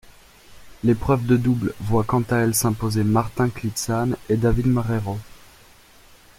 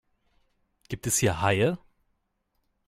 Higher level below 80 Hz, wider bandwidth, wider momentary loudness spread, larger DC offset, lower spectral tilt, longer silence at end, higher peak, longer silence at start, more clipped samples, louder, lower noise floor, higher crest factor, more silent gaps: first, -38 dBFS vs -54 dBFS; about the same, 16.5 kHz vs 15.5 kHz; second, 6 LU vs 15 LU; neither; first, -6 dB/octave vs -4 dB/octave; about the same, 1 s vs 1.1 s; first, -6 dBFS vs -10 dBFS; second, 0.5 s vs 0.9 s; neither; first, -22 LUFS vs -26 LUFS; second, -50 dBFS vs -76 dBFS; about the same, 16 dB vs 20 dB; neither